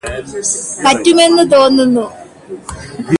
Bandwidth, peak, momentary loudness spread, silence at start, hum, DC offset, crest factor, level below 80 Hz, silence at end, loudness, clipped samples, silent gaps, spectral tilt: 11.5 kHz; 0 dBFS; 20 LU; 0.05 s; none; under 0.1%; 12 dB; -40 dBFS; 0.05 s; -10 LUFS; under 0.1%; none; -3.5 dB/octave